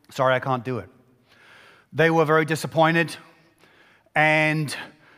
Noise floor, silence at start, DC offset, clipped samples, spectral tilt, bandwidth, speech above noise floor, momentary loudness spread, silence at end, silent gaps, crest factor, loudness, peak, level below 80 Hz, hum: -57 dBFS; 0.1 s; under 0.1%; under 0.1%; -5.5 dB/octave; 15.5 kHz; 35 dB; 15 LU; 0.3 s; none; 18 dB; -21 LUFS; -4 dBFS; -66 dBFS; none